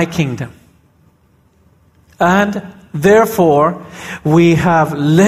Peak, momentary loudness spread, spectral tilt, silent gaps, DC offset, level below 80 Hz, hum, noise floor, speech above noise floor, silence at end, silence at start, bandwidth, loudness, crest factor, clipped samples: 0 dBFS; 17 LU; -6.5 dB/octave; none; under 0.1%; -44 dBFS; none; -53 dBFS; 41 dB; 0 s; 0 s; 15.5 kHz; -13 LUFS; 14 dB; under 0.1%